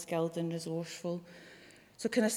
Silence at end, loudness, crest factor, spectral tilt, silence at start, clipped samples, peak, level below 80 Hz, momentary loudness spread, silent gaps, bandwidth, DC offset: 0 s; -37 LUFS; 18 dB; -5 dB/octave; 0 s; under 0.1%; -18 dBFS; -78 dBFS; 20 LU; none; 17 kHz; under 0.1%